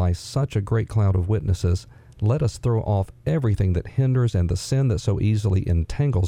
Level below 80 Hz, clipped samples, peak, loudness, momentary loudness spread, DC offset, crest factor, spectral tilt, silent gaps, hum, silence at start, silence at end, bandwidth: -38 dBFS; under 0.1%; -8 dBFS; -23 LUFS; 4 LU; under 0.1%; 12 dB; -7.5 dB/octave; none; none; 0 s; 0 s; 11 kHz